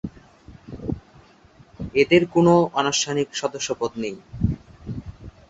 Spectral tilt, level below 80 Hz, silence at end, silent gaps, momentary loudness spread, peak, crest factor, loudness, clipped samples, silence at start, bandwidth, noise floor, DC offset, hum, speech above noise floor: -5 dB/octave; -42 dBFS; 0.2 s; none; 19 LU; -4 dBFS; 20 dB; -21 LUFS; under 0.1%; 0.05 s; 8 kHz; -52 dBFS; under 0.1%; none; 32 dB